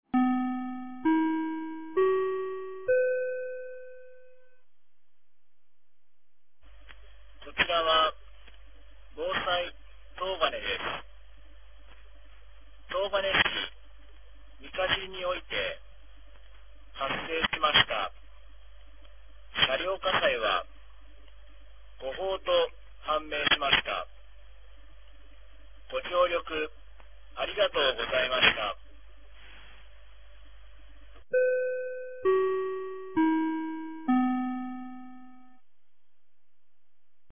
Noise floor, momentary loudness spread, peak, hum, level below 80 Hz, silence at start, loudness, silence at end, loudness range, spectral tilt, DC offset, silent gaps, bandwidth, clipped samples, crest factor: -83 dBFS; 16 LU; -6 dBFS; none; -54 dBFS; 0.05 s; -28 LUFS; 2.05 s; 6 LU; -0.5 dB/octave; 0.6%; none; 3.7 kHz; under 0.1%; 26 dB